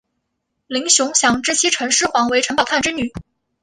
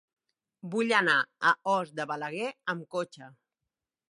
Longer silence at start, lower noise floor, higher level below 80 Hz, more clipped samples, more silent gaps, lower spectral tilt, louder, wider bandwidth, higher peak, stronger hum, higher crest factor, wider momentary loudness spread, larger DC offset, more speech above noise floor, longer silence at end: about the same, 0.7 s vs 0.65 s; second, -74 dBFS vs -88 dBFS; first, -50 dBFS vs -84 dBFS; neither; neither; second, -1 dB/octave vs -4 dB/octave; first, -16 LUFS vs -29 LUFS; about the same, 11.5 kHz vs 11.5 kHz; first, -2 dBFS vs -10 dBFS; neither; about the same, 18 dB vs 22 dB; about the same, 10 LU vs 12 LU; neither; about the same, 57 dB vs 59 dB; second, 0.4 s vs 0.8 s